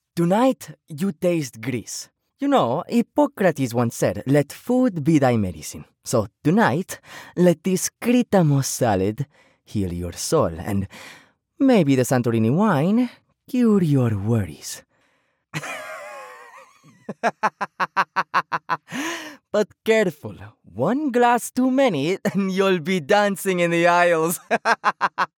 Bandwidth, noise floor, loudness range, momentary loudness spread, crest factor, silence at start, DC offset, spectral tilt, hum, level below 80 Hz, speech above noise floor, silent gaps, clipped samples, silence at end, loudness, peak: 19 kHz; -67 dBFS; 6 LU; 15 LU; 18 dB; 0.15 s; under 0.1%; -5.5 dB/octave; none; -56 dBFS; 46 dB; none; under 0.1%; 0.15 s; -21 LUFS; -4 dBFS